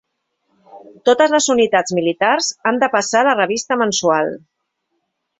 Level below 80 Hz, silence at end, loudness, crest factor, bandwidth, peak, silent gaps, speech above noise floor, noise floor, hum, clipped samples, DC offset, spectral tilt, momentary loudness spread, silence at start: -62 dBFS; 1 s; -16 LUFS; 16 dB; 8.4 kHz; -2 dBFS; none; 56 dB; -72 dBFS; none; under 0.1%; under 0.1%; -2.5 dB/octave; 6 LU; 0.75 s